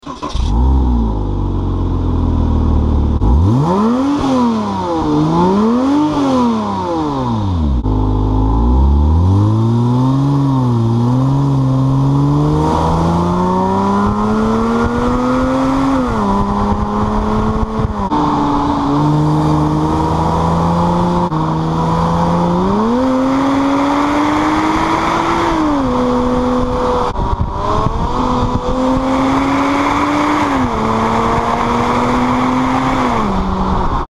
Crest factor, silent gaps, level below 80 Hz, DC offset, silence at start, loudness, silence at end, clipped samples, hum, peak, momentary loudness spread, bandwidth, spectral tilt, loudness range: 12 dB; none; -22 dBFS; under 0.1%; 0.05 s; -14 LUFS; 0.05 s; under 0.1%; none; 0 dBFS; 4 LU; 12 kHz; -7.5 dB/octave; 2 LU